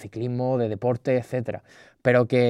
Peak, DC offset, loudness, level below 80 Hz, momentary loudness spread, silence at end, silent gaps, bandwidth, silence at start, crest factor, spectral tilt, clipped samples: -4 dBFS; under 0.1%; -25 LUFS; -62 dBFS; 9 LU; 0 s; none; 11 kHz; 0 s; 20 dB; -8 dB/octave; under 0.1%